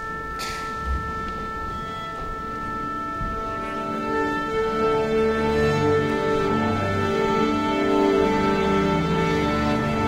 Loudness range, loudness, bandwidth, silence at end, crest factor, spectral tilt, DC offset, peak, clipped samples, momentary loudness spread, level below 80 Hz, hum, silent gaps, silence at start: 7 LU; -23 LUFS; 16 kHz; 0 s; 14 dB; -6.5 dB/octave; under 0.1%; -8 dBFS; under 0.1%; 9 LU; -38 dBFS; none; none; 0 s